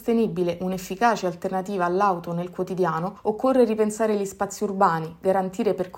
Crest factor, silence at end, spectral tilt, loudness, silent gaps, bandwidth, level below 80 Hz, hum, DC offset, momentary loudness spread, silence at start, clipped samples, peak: 18 dB; 0 s; -6 dB/octave; -24 LUFS; none; 16.5 kHz; -58 dBFS; none; under 0.1%; 8 LU; 0 s; under 0.1%; -6 dBFS